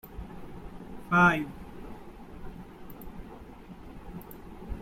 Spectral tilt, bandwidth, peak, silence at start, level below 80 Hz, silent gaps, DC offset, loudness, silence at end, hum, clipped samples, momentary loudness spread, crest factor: -6.5 dB/octave; 16.5 kHz; -10 dBFS; 0.05 s; -48 dBFS; none; under 0.1%; -25 LUFS; 0 s; none; under 0.1%; 25 LU; 22 dB